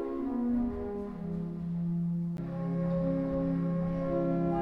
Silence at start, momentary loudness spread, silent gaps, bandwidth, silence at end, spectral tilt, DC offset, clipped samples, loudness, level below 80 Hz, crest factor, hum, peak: 0 s; 6 LU; none; 3.9 kHz; 0 s; -11 dB/octave; under 0.1%; under 0.1%; -33 LUFS; -50 dBFS; 12 dB; none; -20 dBFS